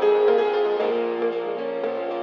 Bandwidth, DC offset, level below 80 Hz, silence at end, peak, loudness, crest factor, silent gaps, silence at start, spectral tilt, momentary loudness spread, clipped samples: 5.8 kHz; under 0.1%; under -90 dBFS; 0 s; -8 dBFS; -23 LUFS; 14 dB; none; 0 s; -6 dB/octave; 8 LU; under 0.1%